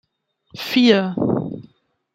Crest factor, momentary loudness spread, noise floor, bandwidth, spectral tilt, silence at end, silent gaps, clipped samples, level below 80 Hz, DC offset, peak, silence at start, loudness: 18 dB; 17 LU; -65 dBFS; 16 kHz; -6 dB/octave; 0.55 s; none; under 0.1%; -60 dBFS; under 0.1%; -2 dBFS; 0.55 s; -18 LUFS